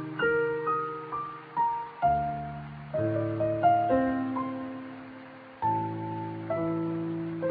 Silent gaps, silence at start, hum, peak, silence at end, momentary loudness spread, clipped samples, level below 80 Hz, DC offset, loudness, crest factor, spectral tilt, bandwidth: none; 0 s; none; -12 dBFS; 0 s; 14 LU; under 0.1%; -58 dBFS; under 0.1%; -30 LUFS; 16 dB; -11 dB/octave; 4.9 kHz